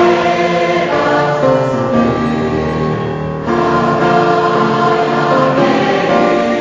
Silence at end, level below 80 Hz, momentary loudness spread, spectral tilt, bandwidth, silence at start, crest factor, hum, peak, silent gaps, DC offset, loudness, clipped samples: 0 s; -38 dBFS; 5 LU; -6.5 dB/octave; 7.6 kHz; 0 s; 12 dB; none; 0 dBFS; none; under 0.1%; -13 LUFS; under 0.1%